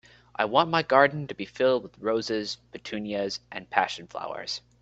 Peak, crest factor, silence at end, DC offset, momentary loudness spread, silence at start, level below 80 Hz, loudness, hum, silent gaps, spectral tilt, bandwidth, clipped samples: -4 dBFS; 24 dB; 0.2 s; under 0.1%; 15 LU; 0.4 s; -64 dBFS; -27 LUFS; none; none; -4.5 dB/octave; 8.2 kHz; under 0.1%